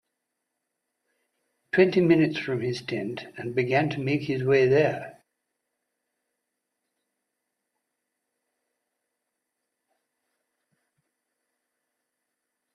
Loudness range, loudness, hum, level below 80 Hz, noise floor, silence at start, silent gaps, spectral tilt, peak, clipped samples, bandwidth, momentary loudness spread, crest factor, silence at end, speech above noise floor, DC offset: 4 LU; -24 LUFS; none; -70 dBFS; -82 dBFS; 1.75 s; none; -7.5 dB/octave; -6 dBFS; under 0.1%; 11 kHz; 13 LU; 24 dB; 7.6 s; 59 dB; under 0.1%